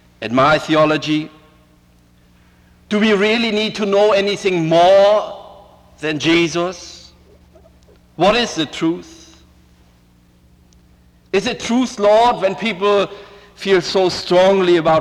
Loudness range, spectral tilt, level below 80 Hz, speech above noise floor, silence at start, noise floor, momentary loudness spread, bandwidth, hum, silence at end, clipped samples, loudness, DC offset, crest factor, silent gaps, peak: 7 LU; -5 dB/octave; -50 dBFS; 36 dB; 0.2 s; -51 dBFS; 12 LU; 12 kHz; 60 Hz at -55 dBFS; 0 s; under 0.1%; -15 LUFS; under 0.1%; 14 dB; none; -4 dBFS